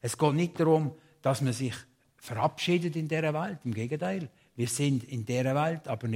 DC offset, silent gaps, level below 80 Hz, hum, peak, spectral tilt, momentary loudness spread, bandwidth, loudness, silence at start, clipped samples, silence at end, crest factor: under 0.1%; none; -68 dBFS; none; -10 dBFS; -6 dB/octave; 9 LU; 16 kHz; -30 LUFS; 0.05 s; under 0.1%; 0 s; 20 dB